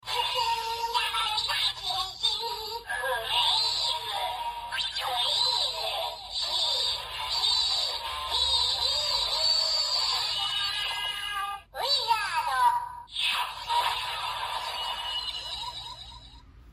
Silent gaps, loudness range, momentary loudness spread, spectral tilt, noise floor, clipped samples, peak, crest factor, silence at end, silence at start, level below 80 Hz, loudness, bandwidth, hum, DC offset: none; 4 LU; 9 LU; 0.5 dB/octave; -50 dBFS; under 0.1%; -12 dBFS; 16 dB; 0 s; 0.05 s; -54 dBFS; -27 LUFS; 15 kHz; none; under 0.1%